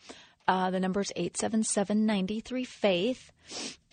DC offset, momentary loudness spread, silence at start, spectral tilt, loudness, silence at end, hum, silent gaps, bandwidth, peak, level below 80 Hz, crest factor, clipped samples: under 0.1%; 11 LU; 0.05 s; -4.5 dB/octave; -30 LUFS; 0.2 s; none; none; 9.4 kHz; -10 dBFS; -66 dBFS; 20 dB; under 0.1%